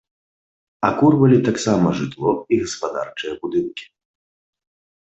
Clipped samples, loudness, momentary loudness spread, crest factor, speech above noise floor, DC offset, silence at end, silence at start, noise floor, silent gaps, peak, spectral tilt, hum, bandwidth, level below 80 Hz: under 0.1%; -19 LUFS; 13 LU; 18 dB; over 72 dB; under 0.1%; 1.2 s; 0.8 s; under -90 dBFS; none; -2 dBFS; -6.5 dB/octave; none; 8.4 kHz; -54 dBFS